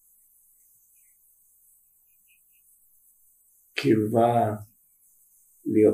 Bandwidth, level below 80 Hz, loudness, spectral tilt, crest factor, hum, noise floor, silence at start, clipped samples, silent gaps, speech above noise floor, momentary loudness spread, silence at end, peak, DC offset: 15.5 kHz; -70 dBFS; -24 LUFS; -7 dB/octave; 20 dB; none; -63 dBFS; 3.75 s; under 0.1%; none; 41 dB; 15 LU; 0 s; -8 dBFS; under 0.1%